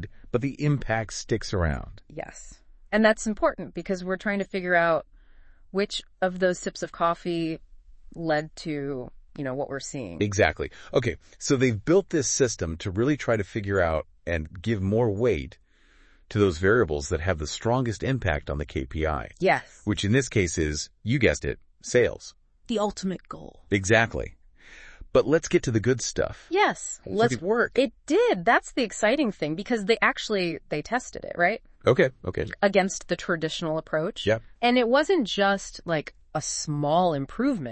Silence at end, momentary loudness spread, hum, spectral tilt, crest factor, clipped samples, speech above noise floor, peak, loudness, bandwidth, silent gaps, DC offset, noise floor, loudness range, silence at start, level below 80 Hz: 0 s; 11 LU; none; -5 dB/octave; 22 dB; under 0.1%; 32 dB; -4 dBFS; -26 LUFS; 8.8 kHz; none; under 0.1%; -57 dBFS; 4 LU; 0 s; -46 dBFS